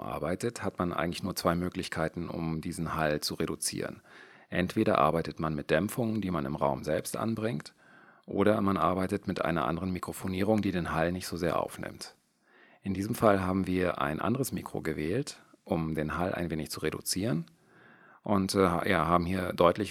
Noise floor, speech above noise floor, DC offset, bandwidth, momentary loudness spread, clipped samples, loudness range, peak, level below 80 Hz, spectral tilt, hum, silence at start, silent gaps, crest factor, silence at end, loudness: -63 dBFS; 33 dB; under 0.1%; 17 kHz; 10 LU; under 0.1%; 3 LU; -8 dBFS; -58 dBFS; -5.5 dB/octave; none; 0 s; none; 24 dB; 0 s; -31 LUFS